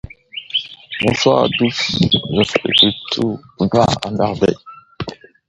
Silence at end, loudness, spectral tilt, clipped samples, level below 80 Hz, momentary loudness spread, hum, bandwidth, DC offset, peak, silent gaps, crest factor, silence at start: 0.35 s; -16 LUFS; -5 dB/octave; under 0.1%; -44 dBFS; 17 LU; none; 11.5 kHz; under 0.1%; 0 dBFS; none; 18 dB; 0.05 s